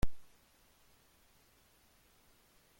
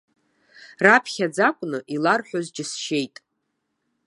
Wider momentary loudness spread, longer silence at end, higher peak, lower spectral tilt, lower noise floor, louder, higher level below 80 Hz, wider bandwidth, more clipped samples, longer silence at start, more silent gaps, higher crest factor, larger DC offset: second, 0 LU vs 13 LU; second, 0 s vs 1 s; second, -18 dBFS vs 0 dBFS; first, -6 dB/octave vs -4 dB/octave; second, -68 dBFS vs -76 dBFS; second, -59 LUFS vs -21 LUFS; first, -50 dBFS vs -78 dBFS; first, 16.5 kHz vs 11.5 kHz; neither; second, 0 s vs 0.6 s; neither; about the same, 22 dB vs 24 dB; neither